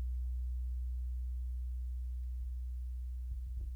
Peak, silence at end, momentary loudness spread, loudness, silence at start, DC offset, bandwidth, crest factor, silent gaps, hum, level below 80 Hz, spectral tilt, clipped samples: -32 dBFS; 0 s; 3 LU; -42 LUFS; 0 s; under 0.1%; 0.4 kHz; 6 dB; none; none; -38 dBFS; -7.5 dB/octave; under 0.1%